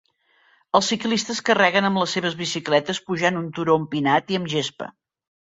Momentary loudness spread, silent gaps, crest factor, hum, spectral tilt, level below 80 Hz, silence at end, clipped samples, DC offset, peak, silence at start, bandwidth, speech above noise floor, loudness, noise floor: 8 LU; none; 20 dB; none; -4 dB/octave; -64 dBFS; 0.5 s; under 0.1%; under 0.1%; -2 dBFS; 0.75 s; 8.2 kHz; 39 dB; -21 LUFS; -61 dBFS